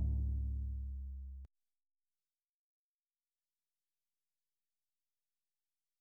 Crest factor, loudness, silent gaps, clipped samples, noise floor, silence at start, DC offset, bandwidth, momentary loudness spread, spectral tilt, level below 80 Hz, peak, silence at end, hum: 18 dB; -43 LUFS; none; under 0.1%; under -90 dBFS; 0 s; under 0.1%; 0.9 kHz; 16 LU; -11.5 dB/octave; -46 dBFS; -28 dBFS; 4.55 s; none